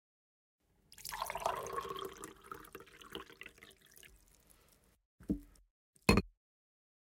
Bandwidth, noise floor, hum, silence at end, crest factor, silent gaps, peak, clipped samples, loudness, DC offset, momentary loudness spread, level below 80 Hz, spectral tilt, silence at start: 17 kHz; -69 dBFS; none; 0.75 s; 30 dB; 5.05-5.18 s, 5.70-5.93 s; -12 dBFS; under 0.1%; -39 LUFS; under 0.1%; 26 LU; -54 dBFS; -5 dB/octave; 1 s